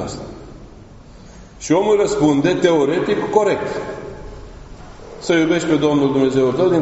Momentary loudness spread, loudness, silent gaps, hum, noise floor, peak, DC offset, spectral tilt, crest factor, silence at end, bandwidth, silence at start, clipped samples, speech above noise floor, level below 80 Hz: 20 LU; -16 LUFS; none; none; -40 dBFS; 0 dBFS; under 0.1%; -5 dB/octave; 18 dB; 0 s; 8 kHz; 0 s; under 0.1%; 24 dB; -42 dBFS